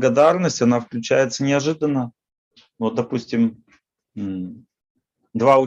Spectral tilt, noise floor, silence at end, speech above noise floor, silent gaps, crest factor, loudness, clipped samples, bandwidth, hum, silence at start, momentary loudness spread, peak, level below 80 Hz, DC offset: -5.5 dB/octave; -61 dBFS; 0 s; 42 dB; 2.38-2.51 s, 4.90-4.95 s; 18 dB; -20 LUFS; under 0.1%; 8.4 kHz; none; 0 s; 15 LU; -2 dBFS; -66 dBFS; under 0.1%